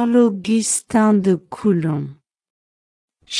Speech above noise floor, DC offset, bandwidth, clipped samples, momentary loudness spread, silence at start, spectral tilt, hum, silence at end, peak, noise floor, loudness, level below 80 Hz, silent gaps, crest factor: over 73 dB; under 0.1%; 12 kHz; under 0.1%; 8 LU; 0 s; -5 dB/octave; none; 0 s; -4 dBFS; under -90 dBFS; -18 LUFS; -60 dBFS; 2.50-3.08 s; 16 dB